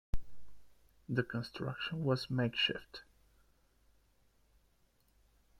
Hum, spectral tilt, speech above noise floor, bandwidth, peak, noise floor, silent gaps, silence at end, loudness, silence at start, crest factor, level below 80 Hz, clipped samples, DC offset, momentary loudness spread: none; -6 dB/octave; 36 dB; 14 kHz; -18 dBFS; -72 dBFS; none; 2.6 s; -36 LUFS; 0.15 s; 20 dB; -54 dBFS; under 0.1%; under 0.1%; 16 LU